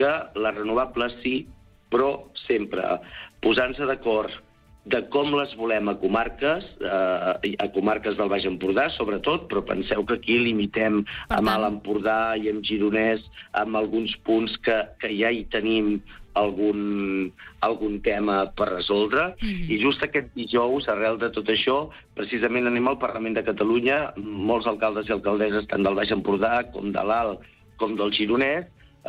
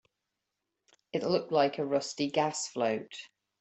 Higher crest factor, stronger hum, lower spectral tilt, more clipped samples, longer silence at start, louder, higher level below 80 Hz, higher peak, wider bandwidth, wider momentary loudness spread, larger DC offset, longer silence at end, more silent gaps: second, 14 dB vs 20 dB; neither; first, -7 dB/octave vs -4 dB/octave; neither; second, 0 s vs 1.15 s; first, -24 LUFS vs -31 LUFS; first, -48 dBFS vs -76 dBFS; about the same, -10 dBFS vs -12 dBFS; first, 14 kHz vs 8.4 kHz; second, 6 LU vs 9 LU; neither; second, 0 s vs 0.35 s; neither